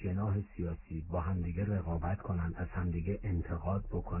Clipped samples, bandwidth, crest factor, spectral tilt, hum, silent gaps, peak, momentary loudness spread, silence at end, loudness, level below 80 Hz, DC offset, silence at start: under 0.1%; 3 kHz; 12 dB; -10.5 dB/octave; none; none; -22 dBFS; 4 LU; 0 s; -37 LUFS; -42 dBFS; under 0.1%; 0 s